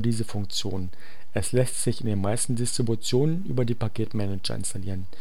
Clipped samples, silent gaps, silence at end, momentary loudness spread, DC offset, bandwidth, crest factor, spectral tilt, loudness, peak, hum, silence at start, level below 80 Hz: under 0.1%; none; 0 s; 9 LU; 5%; 16.5 kHz; 18 dB; -5 dB/octave; -28 LUFS; -8 dBFS; none; 0 s; -52 dBFS